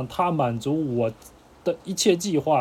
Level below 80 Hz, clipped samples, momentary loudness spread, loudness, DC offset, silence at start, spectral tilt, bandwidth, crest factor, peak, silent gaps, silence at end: -58 dBFS; under 0.1%; 8 LU; -24 LUFS; under 0.1%; 0 s; -5 dB/octave; 16.5 kHz; 18 dB; -6 dBFS; none; 0 s